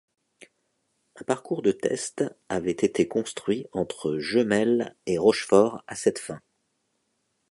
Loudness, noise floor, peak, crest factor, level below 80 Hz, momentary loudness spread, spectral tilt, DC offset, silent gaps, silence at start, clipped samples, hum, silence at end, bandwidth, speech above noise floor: -25 LUFS; -75 dBFS; -6 dBFS; 22 dB; -62 dBFS; 10 LU; -5 dB/octave; under 0.1%; none; 1.15 s; under 0.1%; none; 1.15 s; 11.5 kHz; 50 dB